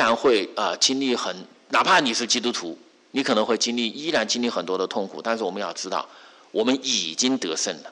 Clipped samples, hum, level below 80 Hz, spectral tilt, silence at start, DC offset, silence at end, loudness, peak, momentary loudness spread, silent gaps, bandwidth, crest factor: under 0.1%; none; -72 dBFS; -2 dB/octave; 0 s; under 0.1%; 0 s; -23 LUFS; -8 dBFS; 11 LU; none; 11 kHz; 16 dB